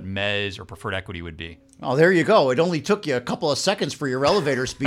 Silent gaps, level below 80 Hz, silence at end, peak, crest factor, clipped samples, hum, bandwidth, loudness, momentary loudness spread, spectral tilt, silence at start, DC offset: none; -52 dBFS; 0 s; -4 dBFS; 18 dB; under 0.1%; none; 15 kHz; -21 LUFS; 16 LU; -5 dB/octave; 0 s; under 0.1%